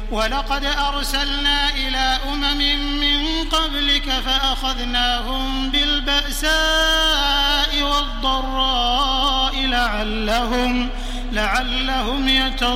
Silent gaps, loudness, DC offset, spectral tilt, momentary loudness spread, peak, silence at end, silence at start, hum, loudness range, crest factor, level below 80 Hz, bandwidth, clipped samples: none; -18 LUFS; under 0.1%; -2.5 dB/octave; 5 LU; -4 dBFS; 0 s; 0 s; none; 2 LU; 14 dB; -26 dBFS; 16 kHz; under 0.1%